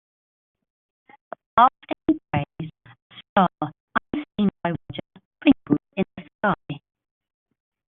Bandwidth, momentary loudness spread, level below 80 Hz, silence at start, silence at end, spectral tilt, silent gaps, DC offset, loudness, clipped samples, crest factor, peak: 4 kHz; 19 LU; -56 dBFS; 1.55 s; 1.15 s; -5 dB/octave; 3.02-3.10 s, 3.29-3.36 s, 3.80-3.88 s, 5.25-5.31 s, 6.35-6.39 s; under 0.1%; -24 LUFS; under 0.1%; 22 dB; -2 dBFS